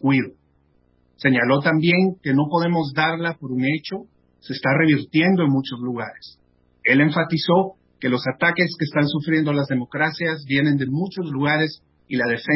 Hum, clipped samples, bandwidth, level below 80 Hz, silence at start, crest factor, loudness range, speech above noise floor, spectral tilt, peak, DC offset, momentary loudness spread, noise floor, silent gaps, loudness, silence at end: none; under 0.1%; 5.8 kHz; -62 dBFS; 0.05 s; 18 dB; 2 LU; 41 dB; -10.5 dB/octave; -4 dBFS; under 0.1%; 10 LU; -61 dBFS; none; -20 LUFS; 0 s